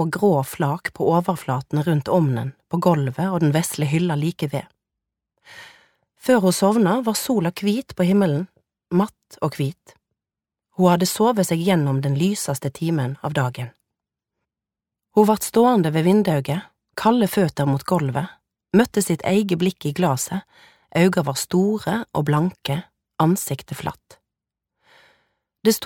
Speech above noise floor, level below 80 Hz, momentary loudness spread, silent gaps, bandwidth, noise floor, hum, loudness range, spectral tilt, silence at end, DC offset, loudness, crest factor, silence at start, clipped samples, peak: 68 dB; -58 dBFS; 10 LU; none; 18 kHz; -88 dBFS; none; 4 LU; -6 dB/octave; 0 s; under 0.1%; -21 LUFS; 20 dB; 0 s; under 0.1%; -2 dBFS